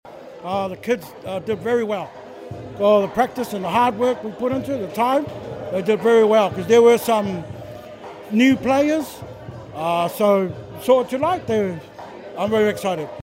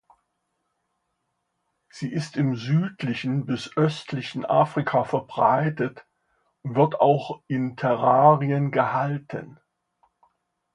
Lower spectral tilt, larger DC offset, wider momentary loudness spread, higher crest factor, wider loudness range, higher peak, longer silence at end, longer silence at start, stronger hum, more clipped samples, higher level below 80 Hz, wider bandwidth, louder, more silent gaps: second, -5.5 dB/octave vs -7.5 dB/octave; neither; first, 20 LU vs 12 LU; about the same, 18 dB vs 22 dB; second, 4 LU vs 7 LU; about the same, -2 dBFS vs -4 dBFS; second, 0.05 s vs 1.2 s; second, 0.05 s vs 1.95 s; neither; neither; first, -56 dBFS vs -68 dBFS; first, 16 kHz vs 10.5 kHz; first, -20 LUFS vs -23 LUFS; neither